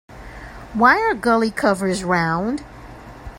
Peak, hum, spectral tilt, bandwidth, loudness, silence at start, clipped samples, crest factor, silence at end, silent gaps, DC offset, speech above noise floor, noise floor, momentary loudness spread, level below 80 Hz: 0 dBFS; none; -5.5 dB/octave; 16 kHz; -18 LUFS; 0.1 s; under 0.1%; 20 dB; 0 s; none; under 0.1%; 20 dB; -38 dBFS; 24 LU; -44 dBFS